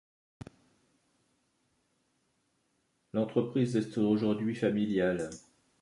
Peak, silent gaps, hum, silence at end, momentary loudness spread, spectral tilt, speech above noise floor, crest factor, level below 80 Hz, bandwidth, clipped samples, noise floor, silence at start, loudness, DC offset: -14 dBFS; none; none; 0.4 s; 23 LU; -7 dB/octave; 46 dB; 20 dB; -66 dBFS; 11.5 kHz; under 0.1%; -76 dBFS; 3.15 s; -31 LUFS; under 0.1%